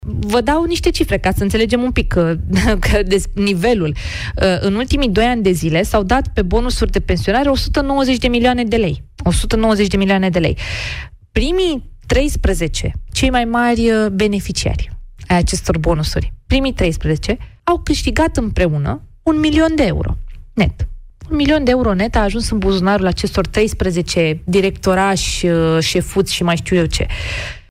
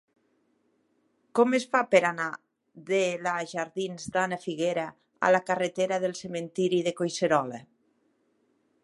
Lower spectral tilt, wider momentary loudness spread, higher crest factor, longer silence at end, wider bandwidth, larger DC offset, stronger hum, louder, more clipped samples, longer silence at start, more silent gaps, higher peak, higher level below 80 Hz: about the same, -5.5 dB/octave vs -4.5 dB/octave; second, 7 LU vs 11 LU; second, 12 dB vs 22 dB; second, 0.1 s vs 1.25 s; first, 16 kHz vs 11.5 kHz; neither; neither; first, -16 LUFS vs -27 LUFS; neither; second, 0 s vs 1.35 s; neither; about the same, -4 dBFS vs -6 dBFS; first, -24 dBFS vs -74 dBFS